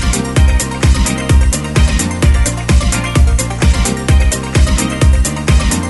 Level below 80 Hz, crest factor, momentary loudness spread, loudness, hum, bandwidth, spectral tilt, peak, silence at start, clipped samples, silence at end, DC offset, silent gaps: -12 dBFS; 10 dB; 2 LU; -13 LUFS; none; 12 kHz; -4.5 dB/octave; 0 dBFS; 0 s; under 0.1%; 0 s; under 0.1%; none